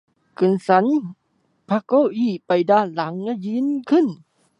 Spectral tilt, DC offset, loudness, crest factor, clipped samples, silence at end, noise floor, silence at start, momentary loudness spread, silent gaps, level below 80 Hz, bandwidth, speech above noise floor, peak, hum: -8 dB/octave; under 0.1%; -20 LUFS; 18 dB; under 0.1%; 0.45 s; -57 dBFS; 0.4 s; 8 LU; none; -72 dBFS; 10.5 kHz; 38 dB; -2 dBFS; none